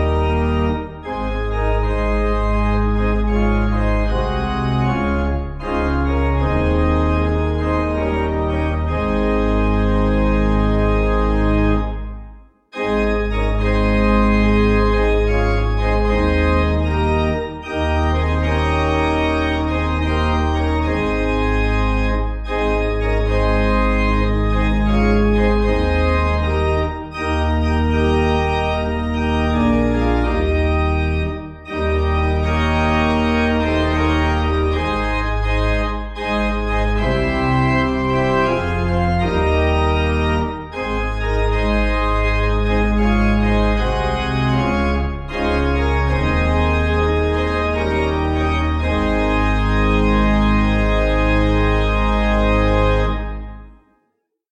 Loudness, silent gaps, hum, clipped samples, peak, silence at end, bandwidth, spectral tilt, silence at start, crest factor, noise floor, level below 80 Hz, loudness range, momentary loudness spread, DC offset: -18 LUFS; none; none; under 0.1%; -2 dBFS; 0.8 s; 8 kHz; -7.5 dB/octave; 0 s; 14 dB; -70 dBFS; -20 dBFS; 2 LU; 5 LU; under 0.1%